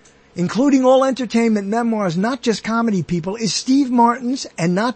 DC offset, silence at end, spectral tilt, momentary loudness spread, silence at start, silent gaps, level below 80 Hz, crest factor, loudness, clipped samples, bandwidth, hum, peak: under 0.1%; 0 s; -5.5 dB/octave; 8 LU; 0.35 s; none; -54 dBFS; 14 dB; -18 LUFS; under 0.1%; 8.8 kHz; none; -2 dBFS